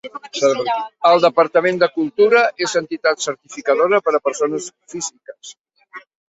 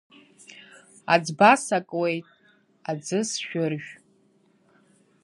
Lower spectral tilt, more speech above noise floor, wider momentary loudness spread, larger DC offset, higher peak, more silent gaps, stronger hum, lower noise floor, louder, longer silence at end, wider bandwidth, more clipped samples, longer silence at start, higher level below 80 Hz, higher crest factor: about the same, -3 dB/octave vs -4 dB/octave; second, 24 dB vs 40 dB; second, 14 LU vs 23 LU; neither; about the same, -2 dBFS vs -2 dBFS; first, 5.60-5.64 s vs none; neither; second, -41 dBFS vs -63 dBFS; first, -17 LUFS vs -24 LUFS; second, 0.3 s vs 1.3 s; second, 8.2 kHz vs 11.5 kHz; neither; second, 0.05 s vs 0.5 s; first, -66 dBFS vs -78 dBFS; second, 16 dB vs 24 dB